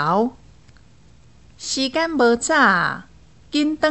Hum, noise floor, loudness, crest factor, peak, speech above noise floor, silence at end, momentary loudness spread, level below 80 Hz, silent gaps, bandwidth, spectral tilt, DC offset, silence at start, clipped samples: none; -51 dBFS; -19 LUFS; 18 dB; -2 dBFS; 32 dB; 0 s; 11 LU; -54 dBFS; none; 8.4 kHz; -3.5 dB/octave; 0.3%; 0 s; under 0.1%